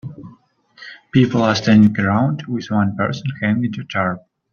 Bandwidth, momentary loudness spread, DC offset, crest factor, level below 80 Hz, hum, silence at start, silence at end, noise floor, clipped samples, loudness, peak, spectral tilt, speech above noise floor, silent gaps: 7 kHz; 15 LU; under 0.1%; 16 dB; -54 dBFS; none; 0.05 s; 0.35 s; -50 dBFS; under 0.1%; -17 LUFS; -2 dBFS; -7 dB/octave; 34 dB; none